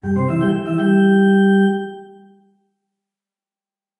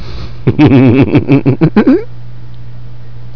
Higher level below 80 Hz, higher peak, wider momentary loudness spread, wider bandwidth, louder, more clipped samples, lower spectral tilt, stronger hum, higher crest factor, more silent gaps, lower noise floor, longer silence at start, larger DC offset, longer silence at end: second, -54 dBFS vs -32 dBFS; second, -4 dBFS vs 0 dBFS; second, 7 LU vs 10 LU; first, 10.5 kHz vs 5.4 kHz; second, -16 LUFS vs -8 LUFS; second, under 0.1% vs 1%; second, -8.5 dB/octave vs -10 dB/octave; neither; about the same, 14 dB vs 10 dB; neither; first, under -90 dBFS vs -29 dBFS; about the same, 0.05 s vs 0 s; second, under 0.1% vs 10%; first, 1.95 s vs 0 s